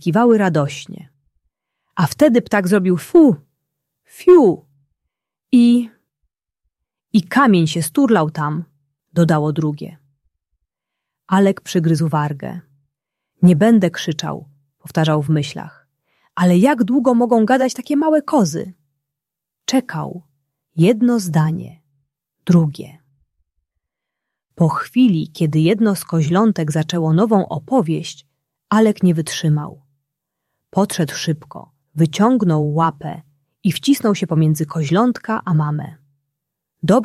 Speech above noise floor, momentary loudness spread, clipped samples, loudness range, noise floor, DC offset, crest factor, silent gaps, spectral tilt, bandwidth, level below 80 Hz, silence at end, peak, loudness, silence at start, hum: 68 dB; 15 LU; under 0.1%; 5 LU; -84 dBFS; under 0.1%; 16 dB; none; -6.5 dB/octave; 14 kHz; -60 dBFS; 0 s; -2 dBFS; -16 LUFS; 0.05 s; none